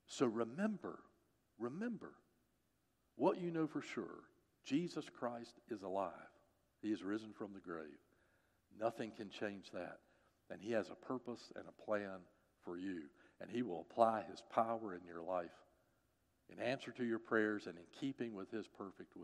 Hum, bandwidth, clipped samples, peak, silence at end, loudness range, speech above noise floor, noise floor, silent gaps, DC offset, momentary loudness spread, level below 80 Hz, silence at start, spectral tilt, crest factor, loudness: none; 11.5 kHz; under 0.1%; -18 dBFS; 0 s; 6 LU; 39 dB; -82 dBFS; none; under 0.1%; 16 LU; -86 dBFS; 0.1 s; -6 dB/octave; 26 dB; -44 LUFS